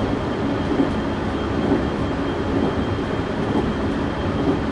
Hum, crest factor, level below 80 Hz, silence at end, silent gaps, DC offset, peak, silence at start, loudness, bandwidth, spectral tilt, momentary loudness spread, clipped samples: none; 14 dB; -34 dBFS; 0 s; none; under 0.1%; -6 dBFS; 0 s; -22 LUFS; 10.5 kHz; -7.5 dB/octave; 3 LU; under 0.1%